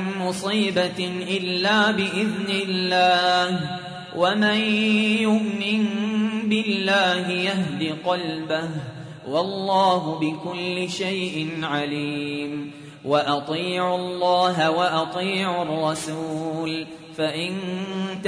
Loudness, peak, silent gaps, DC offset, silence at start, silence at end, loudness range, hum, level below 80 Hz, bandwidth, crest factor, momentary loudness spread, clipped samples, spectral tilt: -23 LUFS; -6 dBFS; none; under 0.1%; 0 s; 0 s; 5 LU; none; -66 dBFS; 11 kHz; 16 dB; 9 LU; under 0.1%; -5 dB/octave